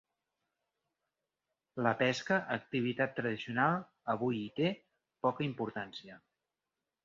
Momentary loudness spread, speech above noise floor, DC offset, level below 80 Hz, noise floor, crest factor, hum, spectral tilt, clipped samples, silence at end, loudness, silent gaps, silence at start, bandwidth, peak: 11 LU; 56 dB; under 0.1%; -76 dBFS; -90 dBFS; 22 dB; none; -4 dB/octave; under 0.1%; 0.85 s; -34 LUFS; none; 1.75 s; 7.4 kHz; -16 dBFS